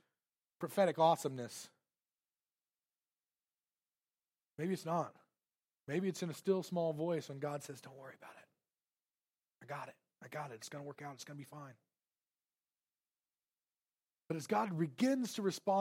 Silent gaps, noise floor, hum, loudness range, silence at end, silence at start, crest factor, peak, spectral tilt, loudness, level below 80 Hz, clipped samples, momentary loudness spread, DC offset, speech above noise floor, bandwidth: none; under -90 dBFS; none; 14 LU; 0 s; 0.6 s; 22 dB; -18 dBFS; -5.5 dB/octave; -39 LUFS; under -90 dBFS; under 0.1%; 20 LU; under 0.1%; over 52 dB; 16 kHz